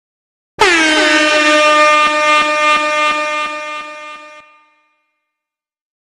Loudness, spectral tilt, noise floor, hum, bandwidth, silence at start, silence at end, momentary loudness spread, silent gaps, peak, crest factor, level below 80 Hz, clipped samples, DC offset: -10 LUFS; -1 dB/octave; -84 dBFS; none; 12 kHz; 0.6 s; 1.65 s; 16 LU; none; 0 dBFS; 14 dB; -52 dBFS; under 0.1%; under 0.1%